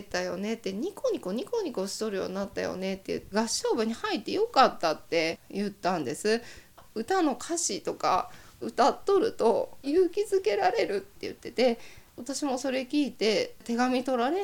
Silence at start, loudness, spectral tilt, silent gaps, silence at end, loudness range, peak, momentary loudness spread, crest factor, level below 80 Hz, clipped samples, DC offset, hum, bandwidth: 0 s; -29 LUFS; -3.5 dB/octave; none; 0 s; 4 LU; -6 dBFS; 9 LU; 22 dB; -62 dBFS; under 0.1%; under 0.1%; none; 19 kHz